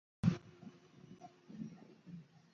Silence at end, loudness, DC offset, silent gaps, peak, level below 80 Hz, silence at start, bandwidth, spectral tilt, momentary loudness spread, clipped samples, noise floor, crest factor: 0.15 s; -41 LUFS; under 0.1%; none; -18 dBFS; -66 dBFS; 0.25 s; 7.2 kHz; -8 dB/octave; 22 LU; under 0.1%; -60 dBFS; 26 dB